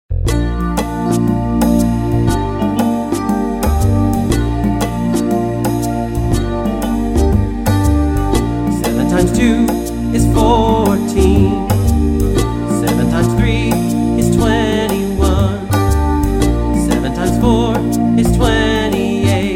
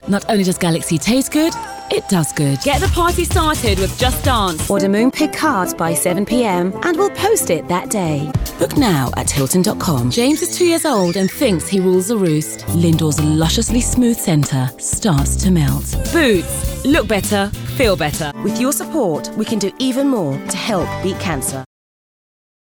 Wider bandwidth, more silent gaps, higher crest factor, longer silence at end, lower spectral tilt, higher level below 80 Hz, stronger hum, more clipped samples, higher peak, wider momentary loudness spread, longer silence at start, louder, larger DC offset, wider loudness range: second, 16.5 kHz vs over 20 kHz; neither; about the same, 14 dB vs 14 dB; second, 0 s vs 1 s; first, -6.5 dB/octave vs -4.5 dB/octave; first, -20 dBFS vs -30 dBFS; neither; neither; about the same, 0 dBFS vs -2 dBFS; about the same, 5 LU vs 5 LU; about the same, 0.1 s vs 0.05 s; about the same, -14 LUFS vs -16 LUFS; neither; about the same, 3 LU vs 3 LU